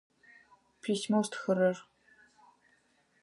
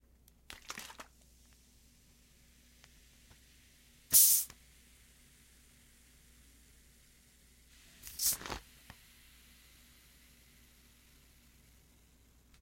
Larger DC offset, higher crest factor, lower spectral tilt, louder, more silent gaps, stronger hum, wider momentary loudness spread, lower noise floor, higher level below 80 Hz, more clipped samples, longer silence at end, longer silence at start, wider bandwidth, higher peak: neither; second, 20 dB vs 32 dB; first, -5.5 dB/octave vs 1 dB/octave; second, -32 LUFS vs -28 LUFS; neither; neither; second, 12 LU vs 32 LU; first, -70 dBFS vs -65 dBFS; second, -84 dBFS vs -64 dBFS; neither; second, 1.4 s vs 4.05 s; first, 0.85 s vs 0.7 s; second, 11.5 kHz vs 16.5 kHz; second, -16 dBFS vs -10 dBFS